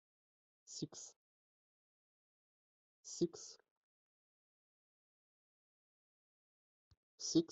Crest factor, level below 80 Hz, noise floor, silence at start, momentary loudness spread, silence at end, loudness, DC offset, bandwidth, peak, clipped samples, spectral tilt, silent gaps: 26 dB; -86 dBFS; under -90 dBFS; 0.7 s; 19 LU; 0 s; -44 LUFS; under 0.1%; 8.2 kHz; -22 dBFS; under 0.1%; -5 dB/octave; 1.16-3.03 s, 3.71-6.91 s, 6.97-7.18 s